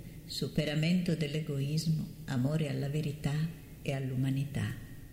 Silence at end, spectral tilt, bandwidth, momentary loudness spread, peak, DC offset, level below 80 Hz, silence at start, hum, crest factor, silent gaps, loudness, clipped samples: 0 s; -6.5 dB/octave; 16 kHz; 8 LU; -16 dBFS; under 0.1%; -54 dBFS; 0 s; none; 16 dB; none; -34 LUFS; under 0.1%